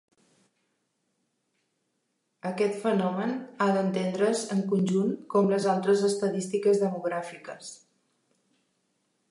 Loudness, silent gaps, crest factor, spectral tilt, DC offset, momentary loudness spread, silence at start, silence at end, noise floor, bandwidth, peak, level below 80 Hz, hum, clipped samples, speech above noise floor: -27 LUFS; none; 18 dB; -6 dB/octave; under 0.1%; 13 LU; 2.45 s; 1.55 s; -77 dBFS; 11.5 kHz; -12 dBFS; -80 dBFS; none; under 0.1%; 51 dB